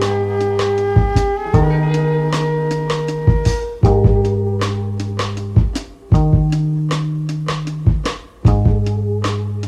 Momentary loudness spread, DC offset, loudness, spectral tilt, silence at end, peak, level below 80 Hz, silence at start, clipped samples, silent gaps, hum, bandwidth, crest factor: 8 LU; under 0.1%; -17 LUFS; -7.5 dB/octave; 0 s; -2 dBFS; -24 dBFS; 0 s; under 0.1%; none; none; 10 kHz; 14 dB